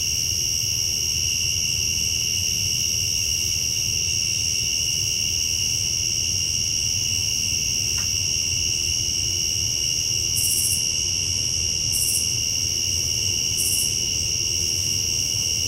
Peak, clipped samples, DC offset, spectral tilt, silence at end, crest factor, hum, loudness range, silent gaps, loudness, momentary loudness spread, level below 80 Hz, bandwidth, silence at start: -8 dBFS; under 0.1%; under 0.1%; 0 dB/octave; 0 s; 14 dB; none; 0 LU; none; -20 LUFS; 1 LU; -42 dBFS; 16 kHz; 0 s